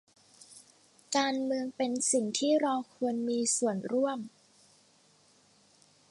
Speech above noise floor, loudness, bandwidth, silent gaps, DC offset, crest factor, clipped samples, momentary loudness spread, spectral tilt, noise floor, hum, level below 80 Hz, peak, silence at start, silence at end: 34 dB; -30 LUFS; 11.5 kHz; none; under 0.1%; 18 dB; under 0.1%; 15 LU; -3 dB/octave; -64 dBFS; none; -84 dBFS; -14 dBFS; 0.5 s; 1.85 s